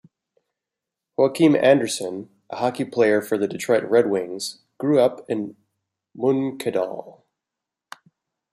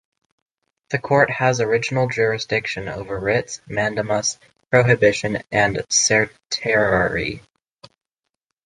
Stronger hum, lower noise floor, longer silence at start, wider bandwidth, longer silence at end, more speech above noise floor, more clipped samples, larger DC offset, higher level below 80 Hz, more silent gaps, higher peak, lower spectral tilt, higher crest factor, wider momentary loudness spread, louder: neither; first, -86 dBFS vs -80 dBFS; first, 1.2 s vs 0.9 s; first, 15.5 kHz vs 11 kHz; first, 1.4 s vs 1.25 s; first, 65 dB vs 61 dB; neither; neither; second, -72 dBFS vs -48 dBFS; neither; about the same, -2 dBFS vs -2 dBFS; first, -5 dB/octave vs -3.5 dB/octave; about the same, 20 dB vs 20 dB; first, 15 LU vs 11 LU; about the same, -21 LUFS vs -19 LUFS